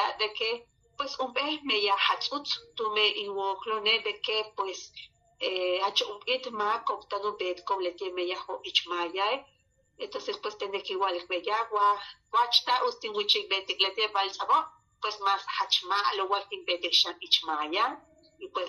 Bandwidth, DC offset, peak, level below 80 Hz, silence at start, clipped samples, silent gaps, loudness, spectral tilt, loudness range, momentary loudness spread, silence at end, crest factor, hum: 12 kHz; under 0.1%; -8 dBFS; -74 dBFS; 0 s; under 0.1%; none; -28 LUFS; -1 dB/octave; 5 LU; 11 LU; 0 s; 22 dB; none